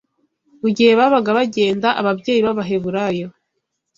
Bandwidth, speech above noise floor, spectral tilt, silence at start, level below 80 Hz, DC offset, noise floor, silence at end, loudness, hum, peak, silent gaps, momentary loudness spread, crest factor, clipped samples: 7.8 kHz; 58 dB; -6 dB/octave; 0.65 s; -58 dBFS; under 0.1%; -74 dBFS; 0.7 s; -17 LUFS; none; -2 dBFS; none; 10 LU; 16 dB; under 0.1%